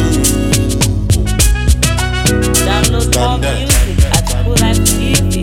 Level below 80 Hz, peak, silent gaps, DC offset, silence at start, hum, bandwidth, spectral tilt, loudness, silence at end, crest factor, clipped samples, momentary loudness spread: -16 dBFS; 0 dBFS; none; under 0.1%; 0 s; none; 17 kHz; -4 dB/octave; -12 LUFS; 0 s; 12 dB; under 0.1%; 2 LU